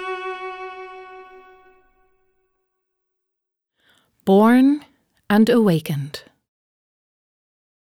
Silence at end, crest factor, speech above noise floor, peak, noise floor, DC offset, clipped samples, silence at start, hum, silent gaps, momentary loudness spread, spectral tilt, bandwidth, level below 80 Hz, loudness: 1.75 s; 18 dB; 66 dB; -4 dBFS; -81 dBFS; under 0.1%; under 0.1%; 0 s; none; none; 23 LU; -7 dB/octave; 16.5 kHz; -66 dBFS; -18 LUFS